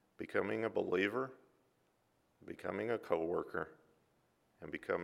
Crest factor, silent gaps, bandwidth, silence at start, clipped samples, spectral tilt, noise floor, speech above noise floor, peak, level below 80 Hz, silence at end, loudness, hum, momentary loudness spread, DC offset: 22 dB; none; 14 kHz; 0.2 s; under 0.1%; -6.5 dB/octave; -77 dBFS; 38 dB; -20 dBFS; -76 dBFS; 0 s; -39 LUFS; none; 13 LU; under 0.1%